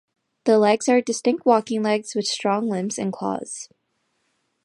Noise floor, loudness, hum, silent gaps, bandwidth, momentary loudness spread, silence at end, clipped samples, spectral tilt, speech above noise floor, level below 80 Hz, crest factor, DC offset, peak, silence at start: -71 dBFS; -21 LUFS; none; none; 11.5 kHz; 11 LU; 1 s; under 0.1%; -4.5 dB/octave; 50 dB; -74 dBFS; 18 dB; under 0.1%; -4 dBFS; 0.45 s